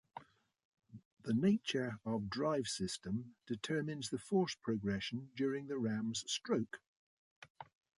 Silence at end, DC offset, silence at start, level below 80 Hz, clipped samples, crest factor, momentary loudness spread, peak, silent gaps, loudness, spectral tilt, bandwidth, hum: 0.35 s; under 0.1%; 0.15 s; -70 dBFS; under 0.1%; 18 dB; 14 LU; -22 dBFS; 0.65-0.72 s, 1.05-1.17 s, 6.88-7.42 s, 7.50-7.55 s; -39 LUFS; -5 dB/octave; 11.5 kHz; none